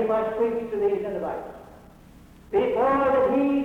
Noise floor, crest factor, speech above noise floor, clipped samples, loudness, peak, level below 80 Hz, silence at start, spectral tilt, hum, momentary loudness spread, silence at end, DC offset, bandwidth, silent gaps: -49 dBFS; 12 dB; 26 dB; under 0.1%; -24 LUFS; -12 dBFS; -52 dBFS; 0 s; -7.5 dB/octave; none; 11 LU; 0 s; under 0.1%; 10.5 kHz; none